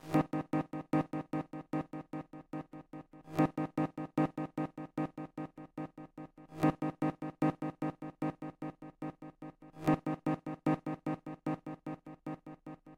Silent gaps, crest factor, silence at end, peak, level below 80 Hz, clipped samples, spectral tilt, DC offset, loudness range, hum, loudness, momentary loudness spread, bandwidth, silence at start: none; 20 dB; 0 s; -18 dBFS; -66 dBFS; under 0.1%; -8.5 dB/octave; under 0.1%; 1 LU; none; -38 LUFS; 16 LU; 16 kHz; 0.05 s